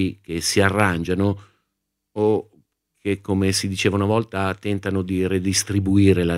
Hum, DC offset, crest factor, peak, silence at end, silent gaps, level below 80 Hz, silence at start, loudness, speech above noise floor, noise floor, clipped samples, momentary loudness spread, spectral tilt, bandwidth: none; under 0.1%; 20 dB; -2 dBFS; 0 s; none; -48 dBFS; 0 s; -21 LUFS; 58 dB; -78 dBFS; under 0.1%; 8 LU; -5 dB/octave; 16 kHz